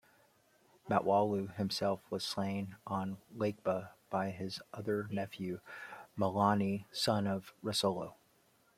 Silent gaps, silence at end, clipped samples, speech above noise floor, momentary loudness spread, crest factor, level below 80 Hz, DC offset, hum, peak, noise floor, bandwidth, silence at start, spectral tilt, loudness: none; 0.65 s; under 0.1%; 35 dB; 12 LU; 22 dB; -74 dBFS; under 0.1%; none; -14 dBFS; -70 dBFS; 16 kHz; 0.85 s; -5.5 dB/octave; -36 LUFS